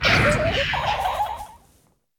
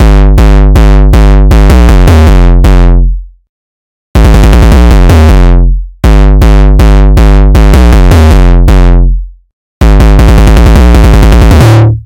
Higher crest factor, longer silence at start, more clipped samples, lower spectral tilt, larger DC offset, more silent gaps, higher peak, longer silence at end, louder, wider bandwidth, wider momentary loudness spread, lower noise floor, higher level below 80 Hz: first, 18 dB vs 2 dB; about the same, 0 s vs 0 s; second, under 0.1% vs 2%; second, -4.5 dB/octave vs -7 dB/octave; neither; second, none vs 3.49-4.14 s, 9.53-9.81 s; second, -6 dBFS vs 0 dBFS; first, 0.6 s vs 0.05 s; second, -21 LUFS vs -5 LUFS; first, 17.5 kHz vs 15 kHz; first, 15 LU vs 5 LU; second, -61 dBFS vs under -90 dBFS; second, -38 dBFS vs -2 dBFS